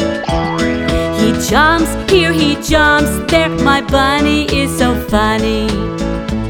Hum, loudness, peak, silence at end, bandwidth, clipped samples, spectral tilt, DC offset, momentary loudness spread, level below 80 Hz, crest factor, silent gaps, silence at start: none; -13 LUFS; 0 dBFS; 0 s; 18.5 kHz; under 0.1%; -4.5 dB/octave; under 0.1%; 6 LU; -24 dBFS; 12 dB; none; 0 s